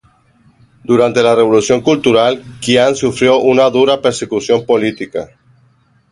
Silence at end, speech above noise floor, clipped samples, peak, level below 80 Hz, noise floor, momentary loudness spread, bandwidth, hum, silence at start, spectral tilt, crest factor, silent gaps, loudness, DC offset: 0.85 s; 41 dB; under 0.1%; 0 dBFS; -50 dBFS; -53 dBFS; 11 LU; 11.5 kHz; none; 0.9 s; -4.5 dB/octave; 14 dB; none; -12 LUFS; under 0.1%